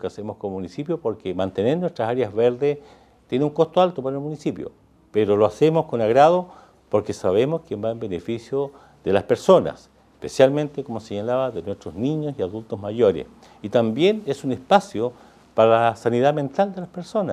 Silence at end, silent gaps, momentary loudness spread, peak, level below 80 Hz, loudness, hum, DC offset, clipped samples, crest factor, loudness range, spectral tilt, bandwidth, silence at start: 0 s; none; 14 LU; -2 dBFS; -58 dBFS; -22 LUFS; none; under 0.1%; under 0.1%; 20 dB; 4 LU; -6.5 dB/octave; 12.5 kHz; 0.05 s